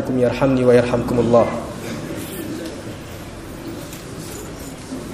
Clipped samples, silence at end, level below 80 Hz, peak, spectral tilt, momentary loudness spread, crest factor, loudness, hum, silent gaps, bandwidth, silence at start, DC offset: under 0.1%; 0 s; -42 dBFS; -2 dBFS; -6.5 dB/octave; 18 LU; 18 dB; -19 LUFS; none; none; 15.5 kHz; 0 s; under 0.1%